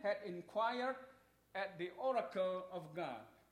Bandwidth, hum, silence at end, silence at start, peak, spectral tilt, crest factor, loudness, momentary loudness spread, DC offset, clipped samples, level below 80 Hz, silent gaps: 14 kHz; none; 0.2 s; 0 s; -26 dBFS; -6 dB/octave; 16 dB; -42 LUFS; 11 LU; under 0.1%; under 0.1%; -82 dBFS; none